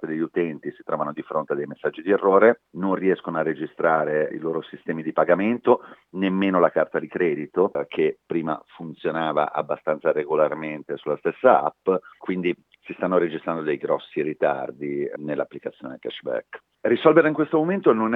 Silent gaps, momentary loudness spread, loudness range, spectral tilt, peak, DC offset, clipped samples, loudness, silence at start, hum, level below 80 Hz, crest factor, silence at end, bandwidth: none; 12 LU; 4 LU; -9 dB/octave; 0 dBFS; under 0.1%; under 0.1%; -23 LUFS; 0 s; none; -72 dBFS; 22 dB; 0 s; 4.1 kHz